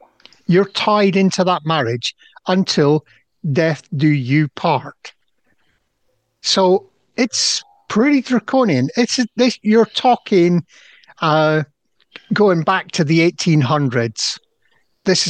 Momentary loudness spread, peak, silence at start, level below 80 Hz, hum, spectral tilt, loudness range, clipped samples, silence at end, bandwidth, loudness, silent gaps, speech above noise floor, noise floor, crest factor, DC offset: 8 LU; -2 dBFS; 0.5 s; -62 dBFS; none; -5 dB/octave; 4 LU; under 0.1%; 0 s; 9.8 kHz; -16 LUFS; none; 51 dB; -67 dBFS; 14 dB; under 0.1%